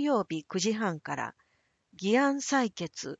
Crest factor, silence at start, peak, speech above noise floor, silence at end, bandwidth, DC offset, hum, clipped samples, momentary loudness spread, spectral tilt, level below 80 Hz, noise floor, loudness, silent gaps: 16 dB; 0 s; -14 dBFS; 44 dB; 0.05 s; 9 kHz; under 0.1%; none; under 0.1%; 10 LU; -4 dB/octave; -74 dBFS; -73 dBFS; -30 LUFS; none